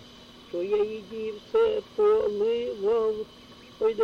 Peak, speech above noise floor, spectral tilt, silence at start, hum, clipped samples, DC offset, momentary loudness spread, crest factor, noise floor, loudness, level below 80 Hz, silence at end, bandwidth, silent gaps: -16 dBFS; 23 dB; -5.5 dB/octave; 0 s; none; under 0.1%; under 0.1%; 12 LU; 12 dB; -49 dBFS; -27 LUFS; -60 dBFS; 0 s; 6.8 kHz; none